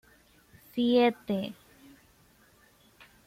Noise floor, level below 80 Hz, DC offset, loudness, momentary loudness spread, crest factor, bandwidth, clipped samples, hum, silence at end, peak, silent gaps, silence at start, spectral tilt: -62 dBFS; -68 dBFS; under 0.1%; -28 LUFS; 17 LU; 20 dB; 16 kHz; under 0.1%; none; 1.75 s; -12 dBFS; none; 0.75 s; -6.5 dB/octave